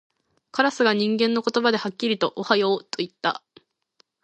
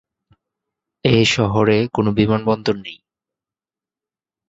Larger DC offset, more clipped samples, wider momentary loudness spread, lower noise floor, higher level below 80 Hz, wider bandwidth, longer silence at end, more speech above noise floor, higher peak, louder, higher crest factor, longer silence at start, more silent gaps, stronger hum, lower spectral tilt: neither; neither; about the same, 7 LU vs 9 LU; second, -65 dBFS vs under -90 dBFS; second, -74 dBFS vs -48 dBFS; first, 9 kHz vs 8 kHz; second, 0.9 s vs 1.55 s; second, 43 dB vs over 73 dB; about the same, -4 dBFS vs -2 dBFS; second, -23 LUFS vs -17 LUFS; about the same, 20 dB vs 18 dB; second, 0.55 s vs 1.05 s; neither; neither; second, -4.5 dB/octave vs -6 dB/octave